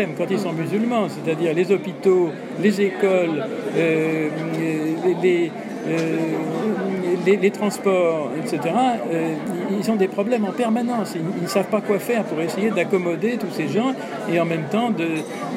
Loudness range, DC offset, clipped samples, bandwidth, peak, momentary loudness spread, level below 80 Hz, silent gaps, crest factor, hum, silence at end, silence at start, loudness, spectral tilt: 2 LU; under 0.1%; under 0.1%; 15.5 kHz; -6 dBFS; 6 LU; -76 dBFS; none; 16 dB; none; 0 s; 0 s; -21 LUFS; -6.5 dB/octave